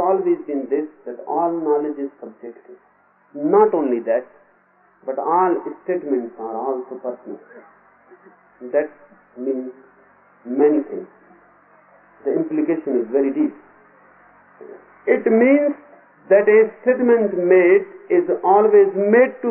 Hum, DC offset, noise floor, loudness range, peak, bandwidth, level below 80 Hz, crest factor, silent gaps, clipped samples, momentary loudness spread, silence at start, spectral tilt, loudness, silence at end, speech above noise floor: none; under 0.1%; -57 dBFS; 12 LU; -2 dBFS; 3.2 kHz; -76 dBFS; 16 dB; none; under 0.1%; 17 LU; 0 s; -1 dB/octave; -18 LUFS; 0 s; 39 dB